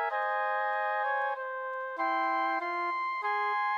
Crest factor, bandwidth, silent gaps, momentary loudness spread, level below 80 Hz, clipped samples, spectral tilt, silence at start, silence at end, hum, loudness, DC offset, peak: 12 dB; over 20 kHz; none; 6 LU; under -90 dBFS; under 0.1%; -1.5 dB/octave; 0 s; 0 s; none; -31 LUFS; under 0.1%; -18 dBFS